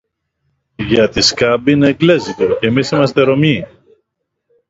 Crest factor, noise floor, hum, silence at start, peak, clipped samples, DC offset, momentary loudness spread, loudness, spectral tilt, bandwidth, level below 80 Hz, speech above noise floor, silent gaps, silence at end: 14 dB; -72 dBFS; none; 0.8 s; 0 dBFS; under 0.1%; under 0.1%; 5 LU; -13 LUFS; -5 dB/octave; 7.8 kHz; -42 dBFS; 60 dB; none; 1.05 s